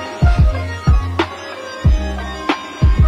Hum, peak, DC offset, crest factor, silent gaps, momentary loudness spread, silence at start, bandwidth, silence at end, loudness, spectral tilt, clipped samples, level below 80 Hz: none; -4 dBFS; under 0.1%; 12 dB; none; 9 LU; 0 s; 8.6 kHz; 0 s; -18 LUFS; -7 dB/octave; under 0.1%; -18 dBFS